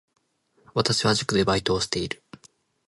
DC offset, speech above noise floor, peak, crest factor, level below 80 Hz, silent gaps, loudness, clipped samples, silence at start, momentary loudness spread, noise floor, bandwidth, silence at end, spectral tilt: under 0.1%; 42 dB; -6 dBFS; 20 dB; -50 dBFS; none; -24 LUFS; under 0.1%; 0.75 s; 10 LU; -66 dBFS; 11.5 kHz; 0.75 s; -4 dB/octave